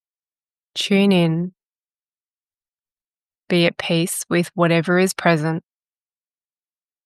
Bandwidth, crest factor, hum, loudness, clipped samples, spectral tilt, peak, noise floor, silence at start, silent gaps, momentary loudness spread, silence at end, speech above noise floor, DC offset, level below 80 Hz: 12.5 kHz; 20 dB; none; -19 LUFS; under 0.1%; -5 dB/octave; -2 dBFS; under -90 dBFS; 0.75 s; 1.66-1.86 s, 1.99-2.03 s, 2.33-2.44 s, 2.74-2.83 s; 9 LU; 1.45 s; over 72 dB; under 0.1%; -68 dBFS